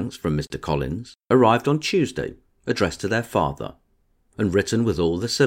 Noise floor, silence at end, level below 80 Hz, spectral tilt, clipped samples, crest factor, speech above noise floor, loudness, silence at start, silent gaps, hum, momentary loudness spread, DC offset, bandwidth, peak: -64 dBFS; 0 s; -44 dBFS; -5.5 dB/octave; under 0.1%; 20 dB; 42 dB; -22 LUFS; 0 s; none; none; 14 LU; under 0.1%; 16.5 kHz; -2 dBFS